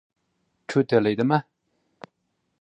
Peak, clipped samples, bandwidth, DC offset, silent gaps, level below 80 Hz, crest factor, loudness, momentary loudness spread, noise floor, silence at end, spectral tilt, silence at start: -6 dBFS; under 0.1%; 9.4 kHz; under 0.1%; none; -68 dBFS; 20 dB; -23 LUFS; 6 LU; -75 dBFS; 1.2 s; -7.5 dB/octave; 0.7 s